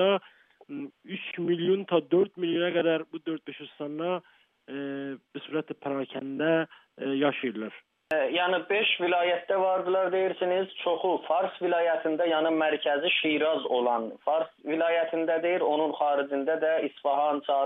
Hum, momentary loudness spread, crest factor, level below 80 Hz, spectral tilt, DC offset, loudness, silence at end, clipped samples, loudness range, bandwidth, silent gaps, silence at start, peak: none; 12 LU; 16 dB; -86 dBFS; -7.5 dB/octave; under 0.1%; -28 LUFS; 0 s; under 0.1%; 6 LU; 4 kHz; none; 0 s; -12 dBFS